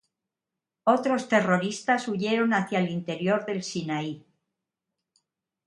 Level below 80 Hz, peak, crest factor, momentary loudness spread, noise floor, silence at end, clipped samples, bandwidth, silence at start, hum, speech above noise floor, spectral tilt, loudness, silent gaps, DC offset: -72 dBFS; -8 dBFS; 20 dB; 8 LU; -88 dBFS; 1.45 s; under 0.1%; 11.5 kHz; 0.85 s; none; 62 dB; -5.5 dB/octave; -26 LUFS; none; under 0.1%